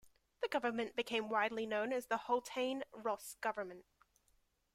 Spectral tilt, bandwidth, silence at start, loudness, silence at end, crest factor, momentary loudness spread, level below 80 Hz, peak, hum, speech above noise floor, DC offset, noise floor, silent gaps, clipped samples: -3 dB/octave; 16 kHz; 0.05 s; -39 LUFS; 0.95 s; 18 dB; 7 LU; -78 dBFS; -22 dBFS; none; 38 dB; under 0.1%; -77 dBFS; none; under 0.1%